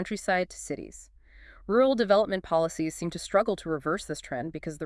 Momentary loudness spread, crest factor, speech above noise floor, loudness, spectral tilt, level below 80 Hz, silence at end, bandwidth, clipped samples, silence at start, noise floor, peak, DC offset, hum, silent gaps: 13 LU; 18 dB; 25 dB; -28 LUFS; -5 dB/octave; -54 dBFS; 0 s; 12 kHz; under 0.1%; 0 s; -52 dBFS; -10 dBFS; under 0.1%; none; none